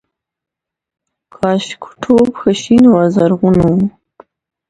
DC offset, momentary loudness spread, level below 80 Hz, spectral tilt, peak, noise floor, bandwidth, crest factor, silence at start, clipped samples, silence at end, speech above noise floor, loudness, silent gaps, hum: under 0.1%; 11 LU; -42 dBFS; -7 dB/octave; 0 dBFS; -84 dBFS; 9.6 kHz; 14 dB; 1.4 s; under 0.1%; 0.8 s; 73 dB; -12 LUFS; none; none